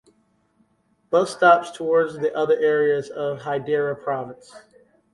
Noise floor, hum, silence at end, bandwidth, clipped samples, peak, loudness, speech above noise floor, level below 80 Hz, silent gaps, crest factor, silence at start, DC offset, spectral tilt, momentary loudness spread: -65 dBFS; none; 0.55 s; 11.5 kHz; under 0.1%; -4 dBFS; -21 LUFS; 44 dB; -68 dBFS; none; 20 dB; 1.1 s; under 0.1%; -5.5 dB/octave; 11 LU